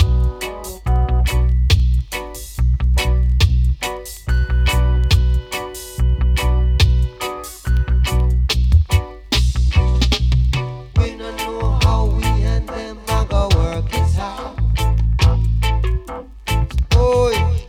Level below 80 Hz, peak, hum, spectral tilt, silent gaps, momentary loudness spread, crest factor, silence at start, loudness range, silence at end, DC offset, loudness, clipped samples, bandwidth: -18 dBFS; -4 dBFS; none; -5.5 dB/octave; none; 10 LU; 12 dB; 0 s; 2 LU; 0 s; under 0.1%; -18 LUFS; under 0.1%; 15.5 kHz